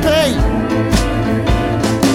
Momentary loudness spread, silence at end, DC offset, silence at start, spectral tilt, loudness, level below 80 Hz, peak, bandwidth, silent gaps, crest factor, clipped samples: 3 LU; 0 s; under 0.1%; 0 s; -5.5 dB/octave; -15 LUFS; -22 dBFS; 0 dBFS; 17 kHz; none; 14 dB; under 0.1%